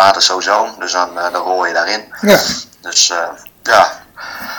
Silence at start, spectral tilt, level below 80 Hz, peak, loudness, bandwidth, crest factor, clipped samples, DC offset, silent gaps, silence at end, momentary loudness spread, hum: 0 s; -1.5 dB/octave; -52 dBFS; 0 dBFS; -13 LUFS; over 20 kHz; 14 dB; 0.7%; under 0.1%; none; 0 s; 12 LU; none